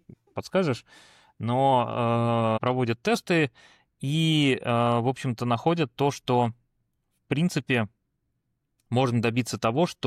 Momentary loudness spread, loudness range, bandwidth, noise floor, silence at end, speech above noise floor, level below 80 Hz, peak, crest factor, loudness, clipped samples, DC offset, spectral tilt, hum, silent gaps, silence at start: 7 LU; 4 LU; 14 kHz; -77 dBFS; 0 s; 52 dB; -64 dBFS; -10 dBFS; 16 dB; -25 LUFS; under 0.1%; under 0.1%; -6 dB/octave; none; none; 0.35 s